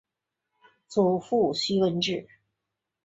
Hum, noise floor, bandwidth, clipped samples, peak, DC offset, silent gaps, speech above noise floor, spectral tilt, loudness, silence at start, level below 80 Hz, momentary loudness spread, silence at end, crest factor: none; -85 dBFS; 8 kHz; under 0.1%; -10 dBFS; under 0.1%; none; 60 dB; -5.5 dB/octave; -26 LUFS; 0.9 s; -70 dBFS; 6 LU; 0.8 s; 18 dB